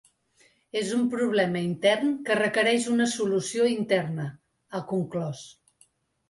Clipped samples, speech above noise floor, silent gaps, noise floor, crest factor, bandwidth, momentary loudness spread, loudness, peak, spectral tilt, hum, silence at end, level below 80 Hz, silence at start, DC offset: under 0.1%; 39 dB; none; -64 dBFS; 16 dB; 11.5 kHz; 12 LU; -26 LUFS; -10 dBFS; -4.5 dB/octave; none; 0.8 s; -70 dBFS; 0.75 s; under 0.1%